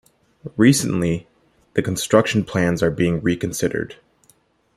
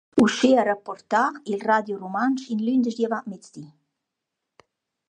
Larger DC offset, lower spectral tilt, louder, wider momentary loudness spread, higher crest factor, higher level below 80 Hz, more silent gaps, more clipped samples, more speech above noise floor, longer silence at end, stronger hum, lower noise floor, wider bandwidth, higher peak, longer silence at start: neither; about the same, -5.5 dB/octave vs -5 dB/octave; first, -20 LUFS vs -23 LUFS; second, 12 LU vs 16 LU; about the same, 18 dB vs 20 dB; first, -50 dBFS vs -66 dBFS; neither; neither; second, 40 dB vs 60 dB; second, 0.85 s vs 1.45 s; neither; second, -59 dBFS vs -83 dBFS; first, 15 kHz vs 10.5 kHz; first, -2 dBFS vs -6 dBFS; first, 0.45 s vs 0.15 s